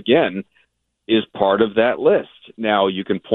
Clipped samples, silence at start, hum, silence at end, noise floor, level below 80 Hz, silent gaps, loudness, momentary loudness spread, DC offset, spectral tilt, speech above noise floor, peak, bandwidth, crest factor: under 0.1%; 0.05 s; none; 0 s; -65 dBFS; -60 dBFS; none; -18 LUFS; 9 LU; under 0.1%; -9 dB/octave; 47 dB; -2 dBFS; 4.2 kHz; 16 dB